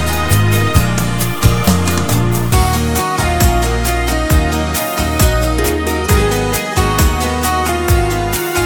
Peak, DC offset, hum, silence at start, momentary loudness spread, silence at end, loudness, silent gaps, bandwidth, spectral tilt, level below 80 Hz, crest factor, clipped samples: 0 dBFS; under 0.1%; none; 0 s; 3 LU; 0 s; -14 LUFS; none; over 20 kHz; -4.5 dB/octave; -20 dBFS; 14 dB; under 0.1%